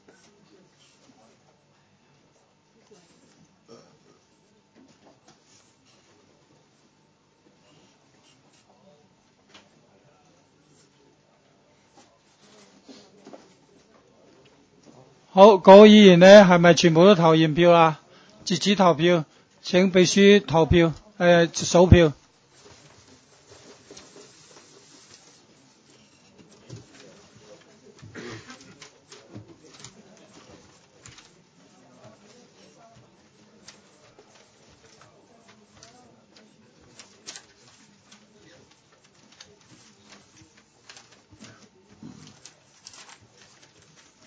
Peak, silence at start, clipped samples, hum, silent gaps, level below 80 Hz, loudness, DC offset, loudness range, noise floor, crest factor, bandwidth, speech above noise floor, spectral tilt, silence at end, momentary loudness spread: 0 dBFS; 15.35 s; under 0.1%; none; none; -44 dBFS; -15 LUFS; under 0.1%; 10 LU; -63 dBFS; 24 dB; 8 kHz; 48 dB; -5.5 dB/octave; 15.9 s; 30 LU